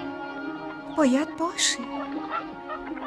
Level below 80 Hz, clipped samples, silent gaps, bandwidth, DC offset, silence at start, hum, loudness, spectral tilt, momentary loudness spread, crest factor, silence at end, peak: -62 dBFS; under 0.1%; none; 13.5 kHz; under 0.1%; 0 s; none; -27 LUFS; -2 dB/octave; 12 LU; 20 dB; 0 s; -8 dBFS